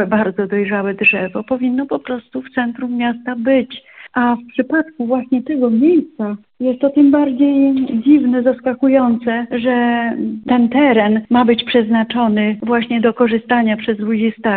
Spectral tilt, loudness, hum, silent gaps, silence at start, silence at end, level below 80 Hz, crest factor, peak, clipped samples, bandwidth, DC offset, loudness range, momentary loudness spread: -4 dB/octave; -15 LUFS; none; none; 0 s; 0 s; -56 dBFS; 14 dB; 0 dBFS; under 0.1%; 4.3 kHz; under 0.1%; 5 LU; 9 LU